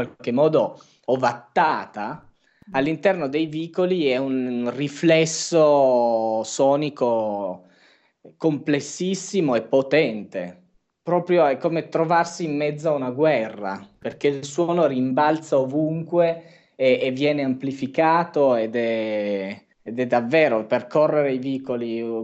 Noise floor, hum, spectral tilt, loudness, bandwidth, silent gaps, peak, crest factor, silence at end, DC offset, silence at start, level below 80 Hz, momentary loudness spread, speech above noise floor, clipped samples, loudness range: -58 dBFS; none; -5.5 dB/octave; -22 LUFS; 8.6 kHz; none; -6 dBFS; 14 dB; 0 s; under 0.1%; 0 s; -70 dBFS; 10 LU; 37 dB; under 0.1%; 4 LU